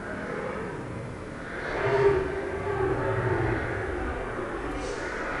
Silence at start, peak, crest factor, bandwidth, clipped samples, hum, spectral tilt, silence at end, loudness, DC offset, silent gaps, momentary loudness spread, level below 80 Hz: 0 s; -10 dBFS; 18 dB; 11 kHz; under 0.1%; none; -6.5 dB/octave; 0 s; -29 LUFS; under 0.1%; none; 12 LU; -42 dBFS